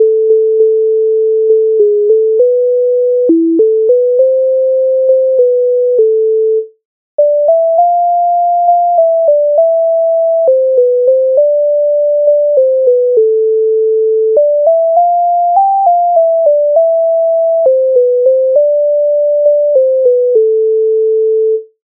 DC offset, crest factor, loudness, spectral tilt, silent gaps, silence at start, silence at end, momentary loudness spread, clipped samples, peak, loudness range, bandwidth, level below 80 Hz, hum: under 0.1%; 8 dB; -10 LUFS; -4.5 dB/octave; 6.85-7.18 s; 0 s; 0.2 s; 2 LU; under 0.1%; 0 dBFS; 1 LU; 1.1 kHz; -74 dBFS; none